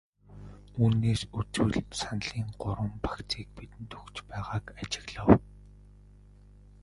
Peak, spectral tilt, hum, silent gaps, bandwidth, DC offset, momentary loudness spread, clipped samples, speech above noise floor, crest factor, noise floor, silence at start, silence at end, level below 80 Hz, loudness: -2 dBFS; -6 dB/octave; 50 Hz at -50 dBFS; none; 11.5 kHz; under 0.1%; 21 LU; under 0.1%; 24 dB; 28 dB; -54 dBFS; 0.3 s; 1.25 s; -46 dBFS; -30 LUFS